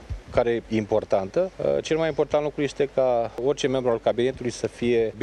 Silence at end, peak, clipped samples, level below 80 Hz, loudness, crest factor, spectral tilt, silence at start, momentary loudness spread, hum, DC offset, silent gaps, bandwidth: 0 s; -6 dBFS; under 0.1%; -46 dBFS; -24 LUFS; 18 dB; -5.5 dB/octave; 0 s; 4 LU; none; under 0.1%; none; 10.5 kHz